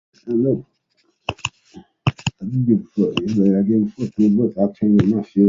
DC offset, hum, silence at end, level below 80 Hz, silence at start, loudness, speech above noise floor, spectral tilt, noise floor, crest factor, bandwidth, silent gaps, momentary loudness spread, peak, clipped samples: under 0.1%; none; 0 s; -48 dBFS; 0.25 s; -19 LUFS; 48 dB; -7.5 dB/octave; -65 dBFS; 16 dB; 7.6 kHz; none; 10 LU; -2 dBFS; under 0.1%